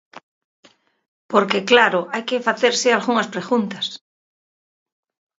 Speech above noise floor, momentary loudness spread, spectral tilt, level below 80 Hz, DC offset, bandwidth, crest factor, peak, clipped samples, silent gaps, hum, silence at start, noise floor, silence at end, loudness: over 72 dB; 11 LU; -3 dB/octave; -72 dBFS; under 0.1%; 7.8 kHz; 22 dB; 0 dBFS; under 0.1%; 0.23-0.63 s, 1.08-1.29 s; none; 0.15 s; under -90 dBFS; 1.45 s; -18 LUFS